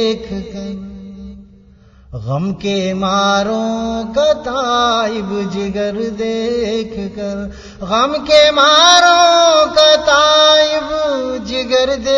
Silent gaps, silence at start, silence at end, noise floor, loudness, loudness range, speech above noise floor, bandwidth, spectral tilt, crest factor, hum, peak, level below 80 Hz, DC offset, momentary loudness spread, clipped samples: none; 0 s; 0 s; -44 dBFS; -12 LUFS; 10 LU; 30 dB; 11 kHz; -3.5 dB/octave; 14 dB; none; 0 dBFS; -42 dBFS; under 0.1%; 18 LU; under 0.1%